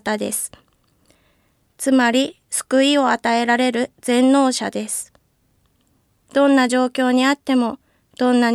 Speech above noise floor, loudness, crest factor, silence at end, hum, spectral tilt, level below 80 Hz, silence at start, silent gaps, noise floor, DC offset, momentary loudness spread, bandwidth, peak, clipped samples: 45 dB; -18 LUFS; 16 dB; 0 s; none; -2.5 dB/octave; -64 dBFS; 0.05 s; none; -62 dBFS; under 0.1%; 10 LU; 14.5 kHz; -4 dBFS; under 0.1%